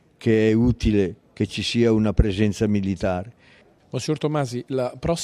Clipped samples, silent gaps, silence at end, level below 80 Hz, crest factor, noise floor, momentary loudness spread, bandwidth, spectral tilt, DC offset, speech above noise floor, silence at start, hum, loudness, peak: under 0.1%; none; 0 s; -34 dBFS; 20 dB; -54 dBFS; 9 LU; 12 kHz; -6.5 dB/octave; under 0.1%; 33 dB; 0.2 s; none; -22 LUFS; -2 dBFS